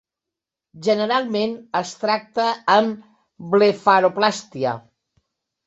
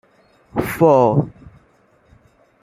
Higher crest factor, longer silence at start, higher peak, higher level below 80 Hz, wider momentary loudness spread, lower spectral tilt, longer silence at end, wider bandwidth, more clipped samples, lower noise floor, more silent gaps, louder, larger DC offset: about the same, 20 dB vs 18 dB; first, 0.75 s vs 0.55 s; about the same, -2 dBFS vs -2 dBFS; second, -68 dBFS vs -50 dBFS; second, 10 LU vs 14 LU; second, -4.5 dB/octave vs -8 dB/octave; second, 0.9 s vs 1.35 s; second, 8 kHz vs 16 kHz; neither; first, -86 dBFS vs -56 dBFS; neither; second, -20 LUFS vs -16 LUFS; neither